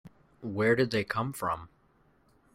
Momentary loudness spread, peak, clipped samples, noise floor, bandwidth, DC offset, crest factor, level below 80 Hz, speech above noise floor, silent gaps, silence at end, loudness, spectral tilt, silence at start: 13 LU; -14 dBFS; under 0.1%; -66 dBFS; 16 kHz; under 0.1%; 18 dB; -62 dBFS; 37 dB; none; 0.9 s; -30 LUFS; -6 dB/octave; 0.05 s